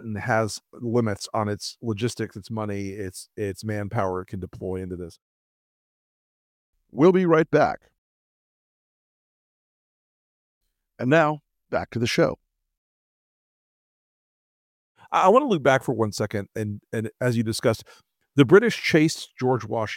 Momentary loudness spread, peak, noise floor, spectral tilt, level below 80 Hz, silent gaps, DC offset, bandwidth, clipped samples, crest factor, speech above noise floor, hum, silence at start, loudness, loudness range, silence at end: 15 LU; -4 dBFS; under -90 dBFS; -6 dB/octave; -60 dBFS; 5.22-6.73 s, 7.98-10.61 s, 12.77-14.95 s; under 0.1%; 16.5 kHz; under 0.1%; 22 dB; over 67 dB; none; 0 s; -23 LUFS; 9 LU; 0 s